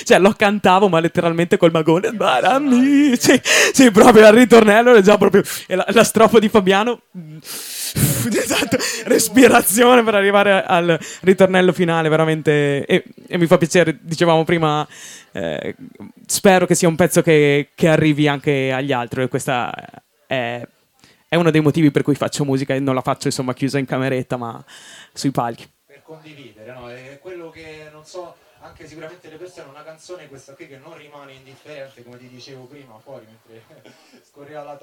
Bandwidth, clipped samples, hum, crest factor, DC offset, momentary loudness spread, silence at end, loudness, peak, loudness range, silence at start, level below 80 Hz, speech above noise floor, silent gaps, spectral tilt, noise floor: 18.5 kHz; under 0.1%; none; 16 dB; under 0.1%; 18 LU; 0.1 s; -15 LUFS; 0 dBFS; 12 LU; 0 s; -52 dBFS; 38 dB; none; -4.5 dB/octave; -54 dBFS